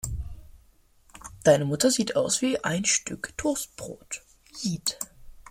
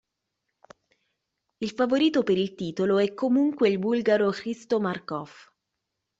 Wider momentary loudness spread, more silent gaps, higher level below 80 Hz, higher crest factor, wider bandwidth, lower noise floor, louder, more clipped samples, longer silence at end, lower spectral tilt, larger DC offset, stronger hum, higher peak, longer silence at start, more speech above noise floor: first, 18 LU vs 12 LU; neither; first, -48 dBFS vs -68 dBFS; first, 22 dB vs 16 dB; first, 16.5 kHz vs 8 kHz; second, -59 dBFS vs -82 dBFS; about the same, -26 LUFS vs -25 LUFS; neither; second, 0.1 s vs 0.9 s; second, -3.5 dB/octave vs -6.5 dB/octave; neither; neither; first, -6 dBFS vs -10 dBFS; second, 0.05 s vs 1.6 s; second, 33 dB vs 58 dB